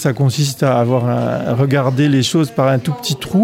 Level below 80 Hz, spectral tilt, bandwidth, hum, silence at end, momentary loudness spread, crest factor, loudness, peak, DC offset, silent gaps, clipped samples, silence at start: -52 dBFS; -6 dB/octave; 16 kHz; none; 0 s; 4 LU; 14 dB; -15 LUFS; -2 dBFS; under 0.1%; none; under 0.1%; 0 s